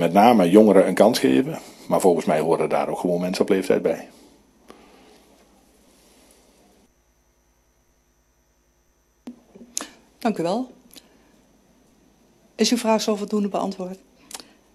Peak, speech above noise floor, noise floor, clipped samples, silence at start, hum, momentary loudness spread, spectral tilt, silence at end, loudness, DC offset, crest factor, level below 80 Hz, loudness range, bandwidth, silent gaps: 0 dBFS; 44 dB; -63 dBFS; under 0.1%; 0 s; none; 21 LU; -5 dB/octave; 0.35 s; -20 LUFS; under 0.1%; 22 dB; -64 dBFS; 14 LU; 14 kHz; none